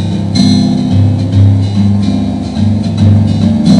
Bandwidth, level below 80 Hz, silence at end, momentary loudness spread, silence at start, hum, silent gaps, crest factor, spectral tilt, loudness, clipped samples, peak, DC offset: 10.5 kHz; -32 dBFS; 0 s; 4 LU; 0 s; 50 Hz at -15 dBFS; none; 8 dB; -7.5 dB/octave; -10 LUFS; 2%; 0 dBFS; 0.6%